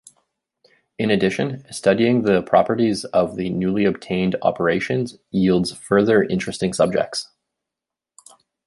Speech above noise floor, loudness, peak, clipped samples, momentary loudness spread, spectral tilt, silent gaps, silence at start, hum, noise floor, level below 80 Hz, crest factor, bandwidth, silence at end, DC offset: 67 dB; -20 LUFS; -2 dBFS; under 0.1%; 8 LU; -6 dB/octave; none; 1 s; none; -86 dBFS; -52 dBFS; 18 dB; 11.5 kHz; 1.4 s; under 0.1%